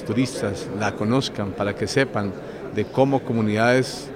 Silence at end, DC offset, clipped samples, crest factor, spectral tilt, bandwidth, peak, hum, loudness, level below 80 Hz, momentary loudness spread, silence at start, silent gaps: 0 s; under 0.1%; under 0.1%; 18 dB; -5.5 dB/octave; 15.5 kHz; -4 dBFS; none; -23 LUFS; -52 dBFS; 9 LU; 0 s; none